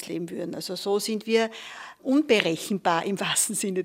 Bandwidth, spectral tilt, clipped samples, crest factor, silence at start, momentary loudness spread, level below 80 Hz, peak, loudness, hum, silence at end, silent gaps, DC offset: 16 kHz; -3 dB/octave; under 0.1%; 24 dB; 0 s; 11 LU; -74 dBFS; -2 dBFS; -25 LUFS; none; 0 s; none; under 0.1%